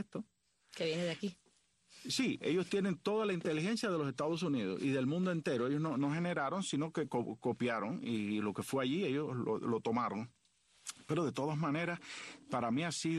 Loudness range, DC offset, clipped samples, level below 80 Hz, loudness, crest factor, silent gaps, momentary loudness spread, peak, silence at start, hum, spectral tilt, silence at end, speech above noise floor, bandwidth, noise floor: 3 LU; under 0.1%; under 0.1%; -78 dBFS; -37 LUFS; 14 dB; none; 10 LU; -22 dBFS; 0 s; none; -5.5 dB/octave; 0 s; 37 dB; 12 kHz; -73 dBFS